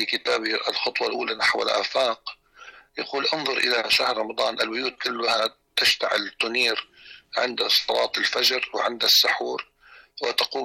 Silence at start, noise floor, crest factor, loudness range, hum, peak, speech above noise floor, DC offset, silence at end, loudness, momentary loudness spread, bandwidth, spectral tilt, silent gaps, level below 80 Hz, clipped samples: 0 s; -48 dBFS; 14 dB; 3 LU; none; -10 dBFS; 24 dB; under 0.1%; 0 s; -22 LUFS; 9 LU; 17 kHz; -0.5 dB/octave; none; -66 dBFS; under 0.1%